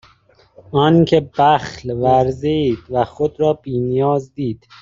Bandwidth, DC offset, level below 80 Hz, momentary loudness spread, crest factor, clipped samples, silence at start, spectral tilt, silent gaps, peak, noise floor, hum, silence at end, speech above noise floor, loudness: 7.6 kHz; under 0.1%; -48 dBFS; 9 LU; 16 dB; under 0.1%; 0.7 s; -7.5 dB/octave; none; 0 dBFS; -53 dBFS; none; 0.25 s; 36 dB; -17 LUFS